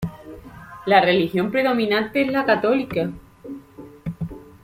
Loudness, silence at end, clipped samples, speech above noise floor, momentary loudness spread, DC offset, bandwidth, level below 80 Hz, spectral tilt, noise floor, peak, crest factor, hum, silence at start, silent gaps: -20 LUFS; 0.2 s; under 0.1%; 23 dB; 23 LU; under 0.1%; 16 kHz; -50 dBFS; -7 dB/octave; -42 dBFS; -2 dBFS; 20 dB; none; 0 s; none